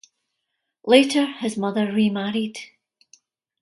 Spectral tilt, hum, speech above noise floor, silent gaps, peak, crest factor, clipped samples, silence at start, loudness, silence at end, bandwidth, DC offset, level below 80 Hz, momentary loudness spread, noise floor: -5 dB/octave; none; 58 dB; none; 0 dBFS; 22 dB; under 0.1%; 0.85 s; -21 LUFS; 0.95 s; 11.5 kHz; under 0.1%; -70 dBFS; 15 LU; -79 dBFS